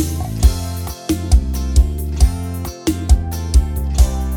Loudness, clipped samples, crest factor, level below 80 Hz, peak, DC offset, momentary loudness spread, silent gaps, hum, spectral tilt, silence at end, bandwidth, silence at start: -18 LUFS; under 0.1%; 16 dB; -16 dBFS; 0 dBFS; under 0.1%; 7 LU; none; none; -6 dB/octave; 0 s; 17.5 kHz; 0 s